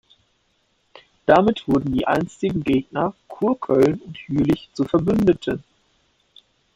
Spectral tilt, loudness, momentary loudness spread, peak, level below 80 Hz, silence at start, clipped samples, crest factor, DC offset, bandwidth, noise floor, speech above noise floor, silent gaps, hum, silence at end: -7.5 dB/octave; -21 LUFS; 10 LU; -2 dBFS; -48 dBFS; 1.3 s; under 0.1%; 20 dB; under 0.1%; 15 kHz; -66 dBFS; 47 dB; none; none; 1.15 s